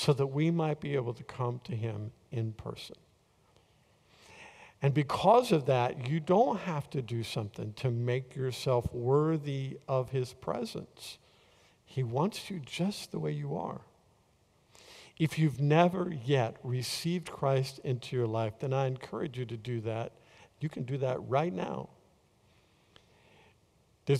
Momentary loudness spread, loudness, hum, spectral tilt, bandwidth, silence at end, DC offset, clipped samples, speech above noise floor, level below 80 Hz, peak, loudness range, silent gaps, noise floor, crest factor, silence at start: 15 LU; -32 LUFS; none; -6.5 dB/octave; 14.5 kHz; 0 s; under 0.1%; under 0.1%; 36 dB; -64 dBFS; -10 dBFS; 8 LU; none; -68 dBFS; 22 dB; 0 s